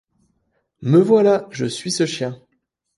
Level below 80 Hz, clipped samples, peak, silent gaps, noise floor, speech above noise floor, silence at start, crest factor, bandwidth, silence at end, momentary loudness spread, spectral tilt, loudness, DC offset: -64 dBFS; under 0.1%; -2 dBFS; none; -71 dBFS; 54 dB; 0.8 s; 16 dB; 11.5 kHz; 0.6 s; 14 LU; -5.5 dB/octave; -18 LUFS; under 0.1%